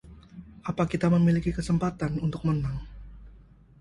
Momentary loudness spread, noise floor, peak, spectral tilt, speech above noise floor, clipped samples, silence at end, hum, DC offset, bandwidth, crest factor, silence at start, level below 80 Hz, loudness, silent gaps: 25 LU; -53 dBFS; -10 dBFS; -8 dB/octave; 27 dB; under 0.1%; 0.45 s; none; under 0.1%; 11 kHz; 18 dB; 0.05 s; -44 dBFS; -27 LUFS; none